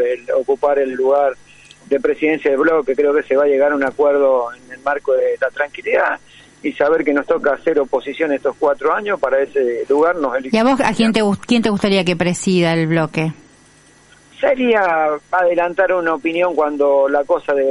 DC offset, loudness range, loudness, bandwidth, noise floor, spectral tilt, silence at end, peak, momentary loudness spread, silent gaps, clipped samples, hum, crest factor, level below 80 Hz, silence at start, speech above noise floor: under 0.1%; 2 LU; -16 LUFS; 11.5 kHz; -48 dBFS; -5.5 dB/octave; 0 s; -2 dBFS; 6 LU; none; under 0.1%; 50 Hz at -60 dBFS; 14 dB; -52 dBFS; 0 s; 32 dB